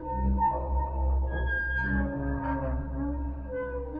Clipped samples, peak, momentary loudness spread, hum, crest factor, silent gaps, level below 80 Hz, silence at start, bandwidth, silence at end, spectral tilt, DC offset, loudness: under 0.1%; -16 dBFS; 7 LU; none; 12 dB; none; -32 dBFS; 0 s; 3.5 kHz; 0 s; -10.5 dB/octave; under 0.1%; -30 LUFS